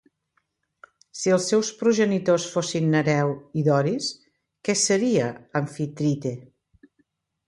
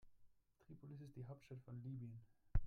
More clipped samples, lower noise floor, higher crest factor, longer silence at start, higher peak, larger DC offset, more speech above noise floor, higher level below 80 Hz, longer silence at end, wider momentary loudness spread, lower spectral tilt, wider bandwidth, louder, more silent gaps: neither; about the same, -72 dBFS vs -70 dBFS; second, 16 dB vs 24 dB; first, 1.15 s vs 0.05 s; first, -8 dBFS vs -24 dBFS; neither; first, 50 dB vs 16 dB; second, -66 dBFS vs -52 dBFS; first, 1.05 s vs 0 s; about the same, 9 LU vs 10 LU; second, -5 dB/octave vs -9 dB/octave; first, 11.5 kHz vs 6.2 kHz; first, -23 LUFS vs -55 LUFS; neither